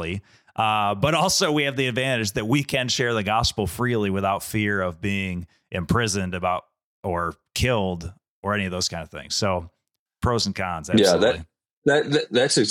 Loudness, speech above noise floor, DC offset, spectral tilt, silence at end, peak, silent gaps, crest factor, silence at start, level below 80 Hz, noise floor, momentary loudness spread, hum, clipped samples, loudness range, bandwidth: -23 LUFS; 39 dB; under 0.1%; -4 dB/octave; 0 s; -4 dBFS; 6.84-7.03 s, 8.28-8.43 s, 9.99-10.06 s, 11.73-11.82 s; 20 dB; 0 s; -46 dBFS; -62 dBFS; 11 LU; none; under 0.1%; 4 LU; 17.5 kHz